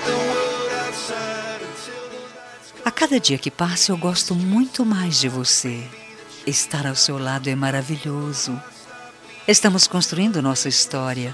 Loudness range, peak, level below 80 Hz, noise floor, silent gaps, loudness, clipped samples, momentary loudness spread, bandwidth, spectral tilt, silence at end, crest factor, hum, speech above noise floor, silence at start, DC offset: 4 LU; 0 dBFS; -62 dBFS; -41 dBFS; none; -20 LUFS; under 0.1%; 20 LU; 13.5 kHz; -3 dB/octave; 0 s; 20 dB; none; 21 dB; 0 s; under 0.1%